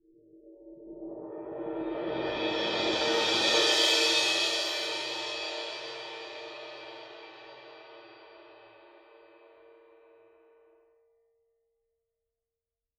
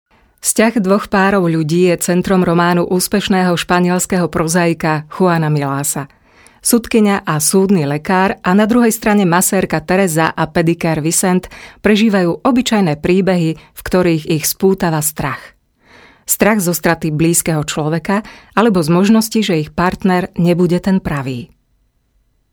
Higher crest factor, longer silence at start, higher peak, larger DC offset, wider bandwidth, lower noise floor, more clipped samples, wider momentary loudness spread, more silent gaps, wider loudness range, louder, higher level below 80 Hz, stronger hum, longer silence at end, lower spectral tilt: first, 22 dB vs 14 dB; about the same, 0.35 s vs 0.45 s; second, -12 dBFS vs 0 dBFS; neither; second, 17.5 kHz vs over 20 kHz; first, under -90 dBFS vs -59 dBFS; neither; first, 25 LU vs 6 LU; neither; first, 21 LU vs 3 LU; second, -27 LUFS vs -14 LUFS; second, -70 dBFS vs -42 dBFS; neither; first, 3.8 s vs 1.05 s; second, -1 dB/octave vs -5 dB/octave